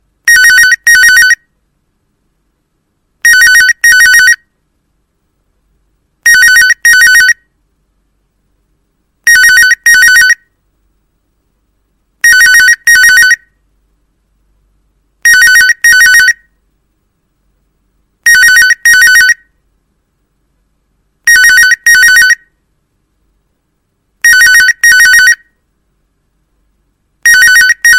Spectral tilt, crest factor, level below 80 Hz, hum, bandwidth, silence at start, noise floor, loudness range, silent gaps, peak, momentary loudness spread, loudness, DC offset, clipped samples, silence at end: 3.5 dB/octave; 8 dB; -44 dBFS; none; 17.5 kHz; 0.25 s; -61 dBFS; 0 LU; none; 0 dBFS; 8 LU; -3 LUFS; under 0.1%; 0.2%; 0 s